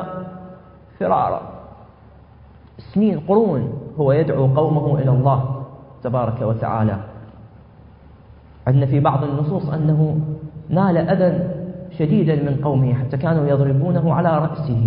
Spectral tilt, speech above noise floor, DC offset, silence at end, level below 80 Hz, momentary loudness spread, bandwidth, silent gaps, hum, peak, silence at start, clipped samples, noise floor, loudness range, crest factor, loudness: -14 dB/octave; 28 dB; under 0.1%; 0 s; -46 dBFS; 13 LU; 4.6 kHz; none; none; -4 dBFS; 0 s; under 0.1%; -45 dBFS; 4 LU; 16 dB; -19 LUFS